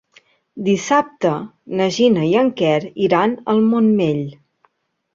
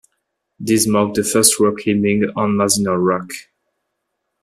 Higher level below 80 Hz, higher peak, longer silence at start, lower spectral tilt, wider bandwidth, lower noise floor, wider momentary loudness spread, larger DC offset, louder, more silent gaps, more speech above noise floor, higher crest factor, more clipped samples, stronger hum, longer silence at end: second, -62 dBFS vs -56 dBFS; about the same, -2 dBFS vs 0 dBFS; about the same, 0.55 s vs 0.6 s; first, -6 dB/octave vs -4 dB/octave; second, 7.6 kHz vs 15 kHz; second, -62 dBFS vs -75 dBFS; about the same, 10 LU vs 11 LU; neither; about the same, -17 LUFS vs -16 LUFS; neither; second, 46 dB vs 58 dB; about the same, 16 dB vs 18 dB; neither; neither; second, 0.8 s vs 1 s